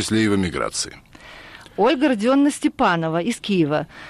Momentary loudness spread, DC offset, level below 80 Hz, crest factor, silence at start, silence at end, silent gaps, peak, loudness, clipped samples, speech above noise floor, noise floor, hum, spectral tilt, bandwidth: 15 LU; under 0.1%; -50 dBFS; 14 dB; 0 s; 0 s; none; -8 dBFS; -20 LUFS; under 0.1%; 22 dB; -42 dBFS; none; -5 dB/octave; 14 kHz